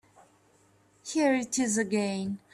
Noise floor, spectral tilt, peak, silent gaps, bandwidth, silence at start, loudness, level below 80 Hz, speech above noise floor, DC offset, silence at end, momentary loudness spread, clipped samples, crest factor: -64 dBFS; -4 dB/octave; -14 dBFS; none; 13.5 kHz; 1.05 s; -28 LUFS; -72 dBFS; 36 dB; under 0.1%; 0.15 s; 8 LU; under 0.1%; 16 dB